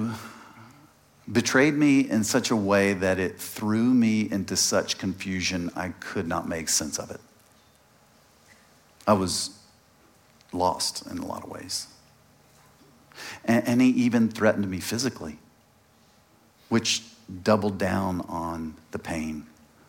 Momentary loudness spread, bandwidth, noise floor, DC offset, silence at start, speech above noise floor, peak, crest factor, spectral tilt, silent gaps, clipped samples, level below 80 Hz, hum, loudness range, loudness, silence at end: 16 LU; 17 kHz; -60 dBFS; under 0.1%; 0 s; 35 dB; -6 dBFS; 22 dB; -4 dB/octave; none; under 0.1%; -62 dBFS; none; 8 LU; -25 LUFS; 0.4 s